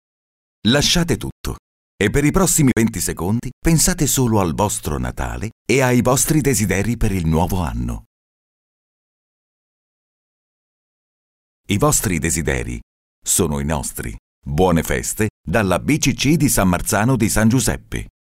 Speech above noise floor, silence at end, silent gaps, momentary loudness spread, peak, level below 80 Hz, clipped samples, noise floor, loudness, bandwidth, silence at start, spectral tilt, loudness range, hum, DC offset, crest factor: over 72 dB; 0.15 s; 1.32-1.44 s, 1.59-1.98 s, 3.53-3.62 s, 5.52-5.65 s, 8.06-11.64 s, 12.83-13.22 s, 14.19-14.42 s, 15.30-15.44 s; 12 LU; -4 dBFS; -32 dBFS; under 0.1%; under -90 dBFS; -18 LUFS; 16.5 kHz; 0.65 s; -4.5 dB/octave; 7 LU; none; under 0.1%; 16 dB